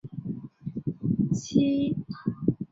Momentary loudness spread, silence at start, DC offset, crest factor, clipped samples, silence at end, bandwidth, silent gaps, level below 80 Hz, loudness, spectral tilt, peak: 13 LU; 0.05 s; under 0.1%; 20 dB; under 0.1%; 0.05 s; 7.8 kHz; none; -56 dBFS; -29 LUFS; -7.5 dB/octave; -8 dBFS